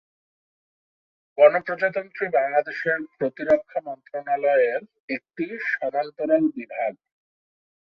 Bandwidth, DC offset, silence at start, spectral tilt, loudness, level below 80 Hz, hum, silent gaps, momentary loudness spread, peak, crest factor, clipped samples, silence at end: 5.8 kHz; under 0.1%; 1.35 s; -7.5 dB/octave; -23 LUFS; -72 dBFS; none; 5.00-5.08 s; 14 LU; -4 dBFS; 22 dB; under 0.1%; 0.95 s